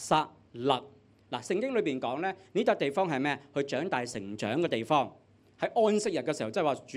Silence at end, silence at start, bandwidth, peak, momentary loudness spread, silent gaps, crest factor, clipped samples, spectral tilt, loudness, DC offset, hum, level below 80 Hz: 0 s; 0 s; 13 kHz; -10 dBFS; 8 LU; none; 20 dB; under 0.1%; -5 dB/octave; -31 LUFS; under 0.1%; none; -72 dBFS